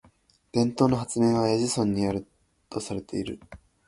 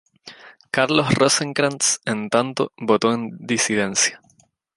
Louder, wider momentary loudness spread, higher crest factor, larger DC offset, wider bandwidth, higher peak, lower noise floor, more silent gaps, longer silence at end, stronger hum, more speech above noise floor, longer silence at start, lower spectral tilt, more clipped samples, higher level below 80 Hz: second, -26 LUFS vs -20 LUFS; first, 13 LU vs 8 LU; about the same, 20 dB vs 20 dB; neither; about the same, 11.5 kHz vs 11.5 kHz; second, -6 dBFS vs -2 dBFS; about the same, -61 dBFS vs -59 dBFS; neither; second, 0.3 s vs 0.6 s; neither; about the same, 36 dB vs 39 dB; first, 0.55 s vs 0.25 s; first, -6 dB/octave vs -3 dB/octave; neither; about the same, -54 dBFS vs -58 dBFS